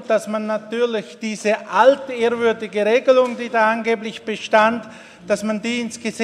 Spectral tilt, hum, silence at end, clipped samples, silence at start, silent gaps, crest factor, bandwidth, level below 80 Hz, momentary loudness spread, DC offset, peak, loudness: -4 dB/octave; none; 0 s; under 0.1%; 0 s; none; 18 dB; 12.5 kHz; -68 dBFS; 12 LU; under 0.1%; 0 dBFS; -19 LUFS